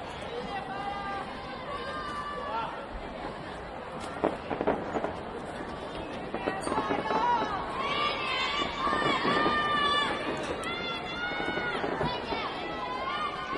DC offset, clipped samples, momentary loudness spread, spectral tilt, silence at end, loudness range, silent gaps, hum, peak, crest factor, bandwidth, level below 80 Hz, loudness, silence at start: under 0.1%; under 0.1%; 12 LU; -4.5 dB/octave; 0 s; 8 LU; none; none; -10 dBFS; 22 dB; 11.5 kHz; -52 dBFS; -31 LUFS; 0 s